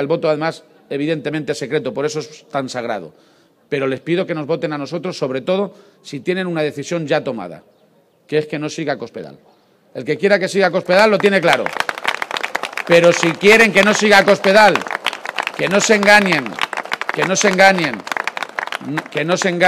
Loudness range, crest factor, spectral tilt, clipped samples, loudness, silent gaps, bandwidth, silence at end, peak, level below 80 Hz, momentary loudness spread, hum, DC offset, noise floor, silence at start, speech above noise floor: 10 LU; 16 dB; -4 dB/octave; under 0.1%; -16 LUFS; none; 15.5 kHz; 0 s; 0 dBFS; -58 dBFS; 14 LU; none; under 0.1%; -55 dBFS; 0 s; 39 dB